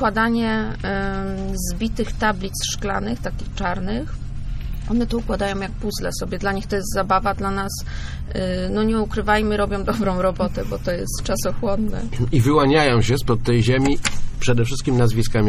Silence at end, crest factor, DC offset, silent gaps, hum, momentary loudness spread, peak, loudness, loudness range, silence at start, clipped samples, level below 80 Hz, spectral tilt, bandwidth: 0 s; 18 dB; under 0.1%; none; none; 9 LU; -2 dBFS; -22 LUFS; 6 LU; 0 s; under 0.1%; -28 dBFS; -5.5 dB/octave; 14 kHz